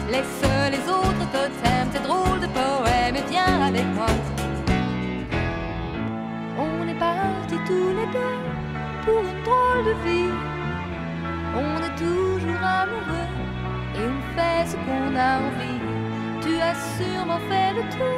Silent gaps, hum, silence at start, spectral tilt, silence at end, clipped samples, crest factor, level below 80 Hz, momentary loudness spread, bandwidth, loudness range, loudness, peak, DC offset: none; none; 0 s; -6 dB/octave; 0 s; under 0.1%; 18 dB; -38 dBFS; 8 LU; 16 kHz; 4 LU; -24 LUFS; -6 dBFS; under 0.1%